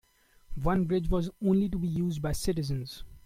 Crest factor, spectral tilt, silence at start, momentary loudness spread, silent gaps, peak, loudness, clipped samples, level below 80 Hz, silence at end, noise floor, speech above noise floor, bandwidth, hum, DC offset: 14 dB; -7 dB/octave; 0.5 s; 8 LU; none; -14 dBFS; -30 LUFS; under 0.1%; -40 dBFS; 0.05 s; -48 dBFS; 20 dB; 16 kHz; none; under 0.1%